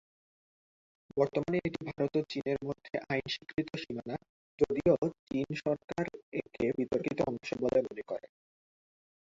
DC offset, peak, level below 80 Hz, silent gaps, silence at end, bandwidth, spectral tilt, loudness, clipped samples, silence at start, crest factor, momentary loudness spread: under 0.1%; -14 dBFS; -62 dBFS; 4.29-4.58 s, 4.98-5.02 s, 5.19-5.27 s, 5.84-5.88 s, 6.23-6.32 s; 1.1 s; 7.8 kHz; -7 dB/octave; -34 LUFS; under 0.1%; 1.15 s; 22 dB; 10 LU